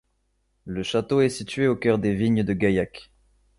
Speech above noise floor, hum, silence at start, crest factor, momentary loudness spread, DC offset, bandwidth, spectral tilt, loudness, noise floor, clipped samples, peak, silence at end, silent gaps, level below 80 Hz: 48 dB; none; 0.65 s; 16 dB; 8 LU; under 0.1%; 11.5 kHz; -6.5 dB/octave; -23 LUFS; -70 dBFS; under 0.1%; -8 dBFS; 0.55 s; none; -50 dBFS